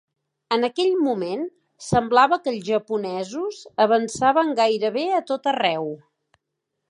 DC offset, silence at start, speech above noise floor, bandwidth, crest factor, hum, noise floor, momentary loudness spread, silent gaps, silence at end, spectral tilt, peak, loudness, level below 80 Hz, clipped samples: under 0.1%; 0.5 s; 59 dB; 11 kHz; 18 dB; none; -80 dBFS; 11 LU; none; 0.95 s; -4.5 dB/octave; -4 dBFS; -22 LUFS; -56 dBFS; under 0.1%